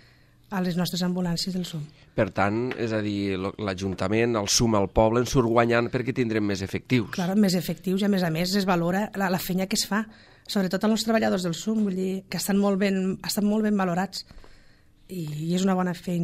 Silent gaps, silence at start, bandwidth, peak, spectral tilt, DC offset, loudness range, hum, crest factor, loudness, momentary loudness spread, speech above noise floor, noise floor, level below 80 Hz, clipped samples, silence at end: none; 0.5 s; 16 kHz; -6 dBFS; -5 dB/octave; under 0.1%; 4 LU; none; 18 dB; -25 LUFS; 8 LU; 31 dB; -56 dBFS; -48 dBFS; under 0.1%; 0 s